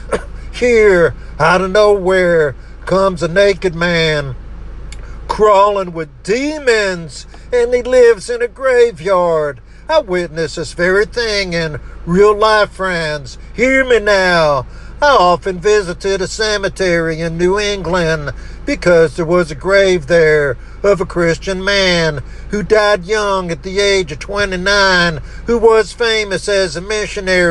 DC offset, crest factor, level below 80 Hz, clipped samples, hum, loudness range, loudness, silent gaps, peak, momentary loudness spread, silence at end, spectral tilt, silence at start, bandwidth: under 0.1%; 14 dB; -30 dBFS; under 0.1%; none; 3 LU; -13 LUFS; none; 0 dBFS; 12 LU; 0 s; -4.5 dB/octave; 0 s; 11.5 kHz